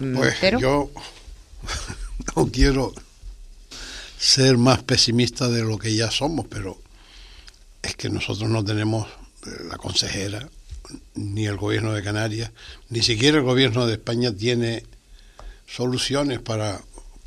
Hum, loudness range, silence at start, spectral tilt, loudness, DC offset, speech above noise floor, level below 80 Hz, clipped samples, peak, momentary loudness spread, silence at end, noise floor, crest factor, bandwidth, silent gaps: none; 7 LU; 0 s; -4.5 dB/octave; -22 LUFS; under 0.1%; 24 dB; -38 dBFS; under 0.1%; -2 dBFS; 19 LU; 0.05 s; -46 dBFS; 22 dB; 14 kHz; none